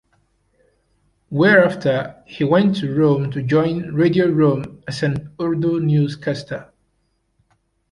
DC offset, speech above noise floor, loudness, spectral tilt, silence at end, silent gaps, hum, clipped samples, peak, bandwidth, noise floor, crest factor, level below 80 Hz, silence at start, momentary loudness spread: under 0.1%; 49 dB; -18 LUFS; -8 dB/octave; 1.3 s; none; none; under 0.1%; -2 dBFS; 11 kHz; -67 dBFS; 18 dB; -54 dBFS; 1.3 s; 13 LU